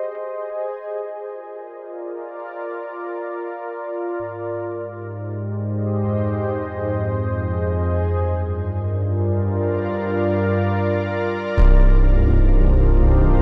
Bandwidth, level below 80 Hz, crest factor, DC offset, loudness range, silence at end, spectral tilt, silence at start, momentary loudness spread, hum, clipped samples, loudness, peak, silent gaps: 3.9 kHz; -20 dBFS; 16 dB; under 0.1%; 11 LU; 0 s; -10.5 dB/octave; 0 s; 13 LU; none; under 0.1%; -22 LUFS; -2 dBFS; none